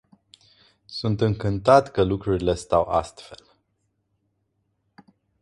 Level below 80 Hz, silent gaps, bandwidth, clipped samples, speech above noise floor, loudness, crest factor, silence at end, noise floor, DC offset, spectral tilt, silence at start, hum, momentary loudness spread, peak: -46 dBFS; none; 11.5 kHz; under 0.1%; 51 dB; -22 LUFS; 22 dB; 2.05 s; -73 dBFS; under 0.1%; -7 dB/octave; 0.9 s; none; 15 LU; -2 dBFS